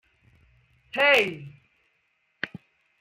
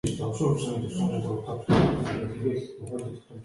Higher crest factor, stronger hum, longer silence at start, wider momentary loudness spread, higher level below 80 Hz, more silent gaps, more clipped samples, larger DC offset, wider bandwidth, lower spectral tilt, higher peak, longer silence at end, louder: about the same, 22 dB vs 18 dB; neither; first, 0.95 s vs 0.05 s; first, 18 LU vs 13 LU; second, -70 dBFS vs -48 dBFS; neither; neither; neither; first, 16 kHz vs 11.5 kHz; second, -3.5 dB/octave vs -7 dB/octave; about the same, -8 dBFS vs -10 dBFS; first, 0.55 s vs 0 s; first, -23 LUFS vs -28 LUFS